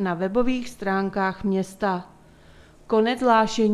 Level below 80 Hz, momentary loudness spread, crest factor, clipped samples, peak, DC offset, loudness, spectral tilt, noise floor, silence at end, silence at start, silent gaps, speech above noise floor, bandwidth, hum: -50 dBFS; 7 LU; 18 dB; under 0.1%; -6 dBFS; under 0.1%; -23 LUFS; -6 dB/octave; -50 dBFS; 0 s; 0 s; none; 28 dB; 13 kHz; none